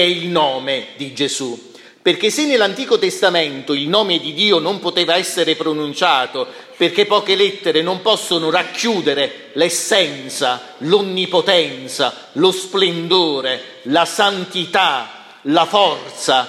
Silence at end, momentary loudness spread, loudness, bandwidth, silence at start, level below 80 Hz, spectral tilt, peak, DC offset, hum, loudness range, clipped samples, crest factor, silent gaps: 0 s; 8 LU; -16 LUFS; 15.5 kHz; 0 s; -70 dBFS; -3 dB/octave; 0 dBFS; under 0.1%; none; 1 LU; under 0.1%; 16 dB; none